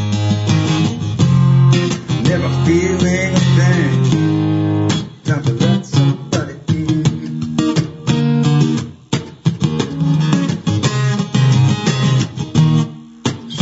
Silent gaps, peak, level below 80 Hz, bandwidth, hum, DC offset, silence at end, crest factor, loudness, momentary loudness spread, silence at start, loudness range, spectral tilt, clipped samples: none; 0 dBFS; -46 dBFS; 8 kHz; none; under 0.1%; 0 s; 14 dB; -15 LUFS; 8 LU; 0 s; 3 LU; -6.5 dB/octave; under 0.1%